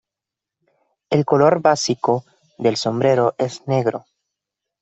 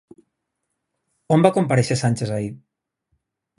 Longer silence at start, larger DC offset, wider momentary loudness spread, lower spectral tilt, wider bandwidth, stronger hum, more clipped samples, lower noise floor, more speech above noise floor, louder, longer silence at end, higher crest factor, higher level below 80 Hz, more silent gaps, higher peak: second, 1.1 s vs 1.3 s; neither; about the same, 9 LU vs 11 LU; about the same, -5.5 dB/octave vs -6.5 dB/octave; second, 8.2 kHz vs 11.5 kHz; neither; neither; first, -86 dBFS vs -78 dBFS; first, 69 dB vs 59 dB; about the same, -19 LUFS vs -20 LUFS; second, 0.8 s vs 1 s; about the same, 18 dB vs 22 dB; second, -62 dBFS vs -56 dBFS; neither; about the same, -2 dBFS vs -2 dBFS